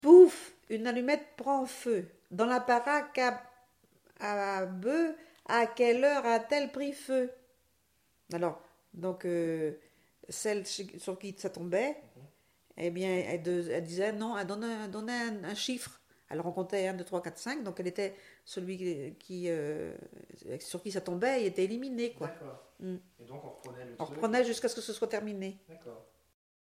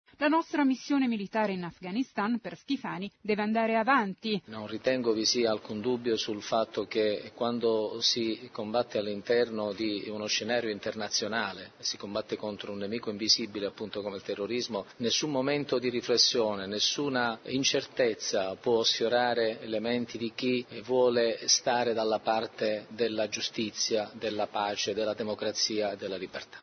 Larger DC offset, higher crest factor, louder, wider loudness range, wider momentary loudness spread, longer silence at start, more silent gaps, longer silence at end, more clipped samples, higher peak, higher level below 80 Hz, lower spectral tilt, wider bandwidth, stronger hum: neither; about the same, 24 dB vs 20 dB; about the same, -32 LUFS vs -30 LUFS; first, 7 LU vs 4 LU; first, 17 LU vs 10 LU; second, 0.05 s vs 0.2 s; neither; first, 0.7 s vs 0 s; neither; about the same, -8 dBFS vs -10 dBFS; about the same, -76 dBFS vs -72 dBFS; first, -5 dB/octave vs -3 dB/octave; first, 15 kHz vs 6.6 kHz; neither